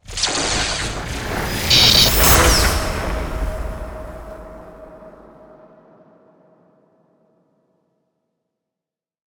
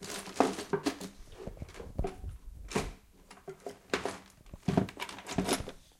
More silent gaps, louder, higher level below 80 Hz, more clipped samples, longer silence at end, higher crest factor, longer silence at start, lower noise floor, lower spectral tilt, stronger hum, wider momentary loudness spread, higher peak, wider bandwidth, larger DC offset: neither; first, -15 LUFS vs -36 LUFS; first, -28 dBFS vs -48 dBFS; neither; first, 4.2 s vs 0.15 s; second, 20 dB vs 30 dB; about the same, 0.1 s vs 0 s; first, -87 dBFS vs -57 dBFS; second, -2.5 dB/octave vs -4.5 dB/octave; neither; first, 24 LU vs 17 LU; first, 0 dBFS vs -6 dBFS; first, over 20 kHz vs 16.5 kHz; neither